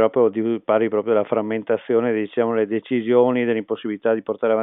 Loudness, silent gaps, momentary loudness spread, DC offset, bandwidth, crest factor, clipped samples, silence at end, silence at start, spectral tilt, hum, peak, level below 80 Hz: -21 LUFS; none; 6 LU; under 0.1%; 3.9 kHz; 16 dB; under 0.1%; 0 s; 0 s; -11.5 dB/octave; none; -4 dBFS; -80 dBFS